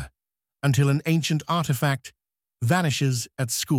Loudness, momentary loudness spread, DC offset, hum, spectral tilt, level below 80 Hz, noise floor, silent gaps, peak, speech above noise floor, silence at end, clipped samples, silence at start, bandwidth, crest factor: -24 LUFS; 7 LU; under 0.1%; none; -5 dB/octave; -56 dBFS; -88 dBFS; none; -8 dBFS; 65 dB; 0 s; under 0.1%; 0 s; 16.5 kHz; 18 dB